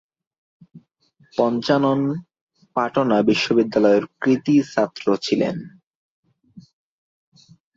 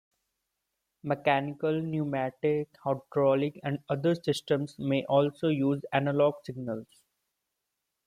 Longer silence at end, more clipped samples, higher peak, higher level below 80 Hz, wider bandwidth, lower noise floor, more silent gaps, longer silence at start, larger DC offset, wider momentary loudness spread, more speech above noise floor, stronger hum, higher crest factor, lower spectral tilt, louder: about the same, 1.15 s vs 1.2 s; neither; first, -4 dBFS vs -12 dBFS; first, -64 dBFS vs -70 dBFS; second, 7.8 kHz vs 14.5 kHz; second, -60 dBFS vs -84 dBFS; first, 2.41-2.47 s, 5.87-6.23 s vs none; second, 0.75 s vs 1.05 s; neither; about the same, 8 LU vs 10 LU; second, 41 dB vs 55 dB; neither; about the same, 18 dB vs 18 dB; about the same, -6 dB/octave vs -7 dB/octave; first, -20 LUFS vs -29 LUFS